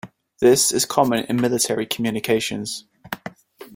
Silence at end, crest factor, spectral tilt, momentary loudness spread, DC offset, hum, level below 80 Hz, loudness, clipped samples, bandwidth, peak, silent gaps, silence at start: 0 s; 20 dB; -3.5 dB/octave; 17 LU; under 0.1%; none; -58 dBFS; -20 LUFS; under 0.1%; 16.5 kHz; -2 dBFS; none; 0.05 s